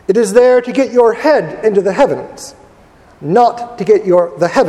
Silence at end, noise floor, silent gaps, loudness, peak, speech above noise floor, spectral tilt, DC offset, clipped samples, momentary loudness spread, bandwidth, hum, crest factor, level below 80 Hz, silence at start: 0 s; -43 dBFS; none; -12 LUFS; 0 dBFS; 32 dB; -5.5 dB/octave; under 0.1%; 0.1%; 14 LU; 13 kHz; none; 12 dB; -50 dBFS; 0.1 s